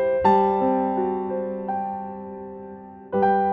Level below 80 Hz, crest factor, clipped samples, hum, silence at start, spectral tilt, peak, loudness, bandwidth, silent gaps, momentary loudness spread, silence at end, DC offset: -56 dBFS; 16 dB; under 0.1%; none; 0 s; -9 dB/octave; -6 dBFS; -23 LUFS; 5.8 kHz; none; 19 LU; 0 s; under 0.1%